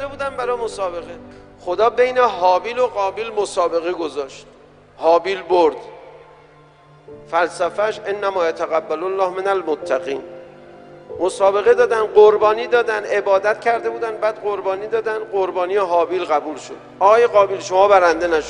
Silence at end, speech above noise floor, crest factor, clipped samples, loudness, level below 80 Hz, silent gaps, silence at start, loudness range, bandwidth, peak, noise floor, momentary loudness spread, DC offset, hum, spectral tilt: 0 s; 30 dB; 18 dB; under 0.1%; -18 LUFS; -54 dBFS; none; 0 s; 6 LU; 10.5 kHz; 0 dBFS; -47 dBFS; 13 LU; under 0.1%; none; -4 dB/octave